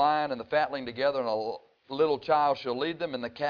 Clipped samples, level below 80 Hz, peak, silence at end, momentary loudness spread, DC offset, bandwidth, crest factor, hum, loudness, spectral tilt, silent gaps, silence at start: under 0.1%; -70 dBFS; -12 dBFS; 0 s; 9 LU; under 0.1%; 5.4 kHz; 16 dB; none; -29 LUFS; -6.5 dB/octave; none; 0 s